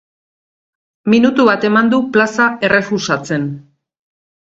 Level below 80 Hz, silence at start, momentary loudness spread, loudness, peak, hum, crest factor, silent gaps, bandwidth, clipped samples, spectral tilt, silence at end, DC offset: -56 dBFS; 1.05 s; 10 LU; -14 LUFS; 0 dBFS; none; 16 dB; none; 7.8 kHz; under 0.1%; -5.5 dB/octave; 0.9 s; under 0.1%